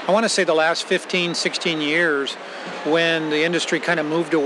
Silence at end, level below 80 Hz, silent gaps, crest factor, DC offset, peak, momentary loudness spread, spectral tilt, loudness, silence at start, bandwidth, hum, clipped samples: 0 s; -88 dBFS; none; 16 dB; under 0.1%; -6 dBFS; 6 LU; -3.5 dB/octave; -20 LUFS; 0 s; 12 kHz; none; under 0.1%